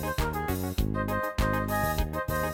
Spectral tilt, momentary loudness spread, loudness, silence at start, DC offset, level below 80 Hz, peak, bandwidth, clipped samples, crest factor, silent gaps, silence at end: -5.5 dB/octave; 3 LU; -29 LUFS; 0 s; under 0.1%; -34 dBFS; -14 dBFS; 17 kHz; under 0.1%; 14 dB; none; 0 s